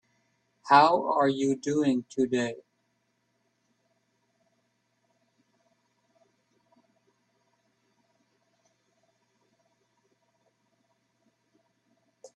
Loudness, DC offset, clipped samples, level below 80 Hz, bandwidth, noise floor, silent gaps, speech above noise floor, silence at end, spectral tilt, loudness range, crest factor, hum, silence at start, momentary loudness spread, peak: -25 LUFS; under 0.1%; under 0.1%; -76 dBFS; 9.2 kHz; -75 dBFS; none; 51 dB; 9.8 s; -5 dB/octave; 10 LU; 28 dB; none; 0.65 s; 10 LU; -4 dBFS